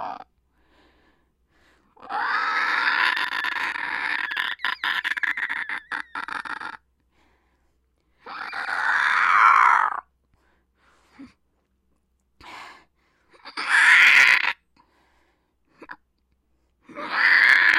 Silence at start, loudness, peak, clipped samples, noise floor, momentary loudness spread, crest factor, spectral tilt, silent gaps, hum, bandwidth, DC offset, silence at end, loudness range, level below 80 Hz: 0 s; -19 LUFS; -2 dBFS; under 0.1%; -70 dBFS; 22 LU; 22 dB; 0.5 dB/octave; none; none; 16 kHz; under 0.1%; 0 s; 11 LU; -68 dBFS